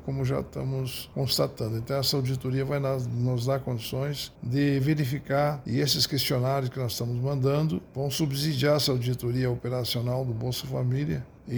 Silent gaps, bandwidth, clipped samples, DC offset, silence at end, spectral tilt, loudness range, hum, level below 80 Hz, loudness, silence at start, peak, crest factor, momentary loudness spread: none; over 20 kHz; under 0.1%; under 0.1%; 0 s; -5.5 dB/octave; 2 LU; none; -52 dBFS; -28 LUFS; 0 s; -10 dBFS; 18 dB; 7 LU